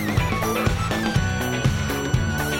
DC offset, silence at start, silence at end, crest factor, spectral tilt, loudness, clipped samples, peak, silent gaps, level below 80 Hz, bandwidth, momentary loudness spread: under 0.1%; 0 s; 0 s; 16 dB; -5 dB/octave; -23 LUFS; under 0.1%; -6 dBFS; none; -32 dBFS; 16.5 kHz; 1 LU